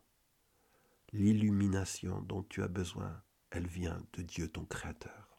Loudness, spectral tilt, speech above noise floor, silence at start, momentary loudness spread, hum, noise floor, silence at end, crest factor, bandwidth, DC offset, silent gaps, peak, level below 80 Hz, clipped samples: -37 LUFS; -6 dB/octave; 38 dB; 1.15 s; 15 LU; none; -75 dBFS; 0.15 s; 18 dB; 14.5 kHz; under 0.1%; none; -20 dBFS; -56 dBFS; under 0.1%